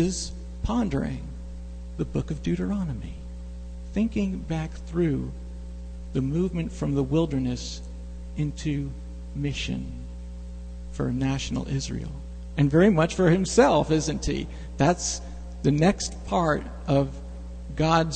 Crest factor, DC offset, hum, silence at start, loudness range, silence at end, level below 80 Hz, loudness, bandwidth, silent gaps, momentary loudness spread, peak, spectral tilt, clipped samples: 22 dB; 0.1%; 60 Hz at -35 dBFS; 0 s; 8 LU; 0 s; -36 dBFS; -26 LUFS; 9.2 kHz; none; 19 LU; -4 dBFS; -6 dB/octave; under 0.1%